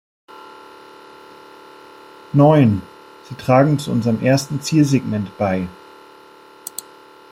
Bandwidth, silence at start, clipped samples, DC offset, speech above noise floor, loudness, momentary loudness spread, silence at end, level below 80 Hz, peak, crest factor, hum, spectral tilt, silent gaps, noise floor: 16.5 kHz; 0.35 s; under 0.1%; under 0.1%; 29 dB; -17 LUFS; 22 LU; 1.6 s; -56 dBFS; -2 dBFS; 18 dB; none; -7 dB/octave; none; -45 dBFS